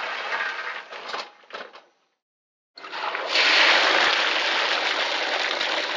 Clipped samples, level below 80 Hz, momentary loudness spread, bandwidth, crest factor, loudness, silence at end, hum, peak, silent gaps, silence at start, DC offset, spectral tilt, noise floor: under 0.1%; -82 dBFS; 19 LU; 7.6 kHz; 20 dB; -20 LUFS; 0 s; none; -6 dBFS; 2.22-2.74 s; 0 s; under 0.1%; 0.5 dB/octave; -52 dBFS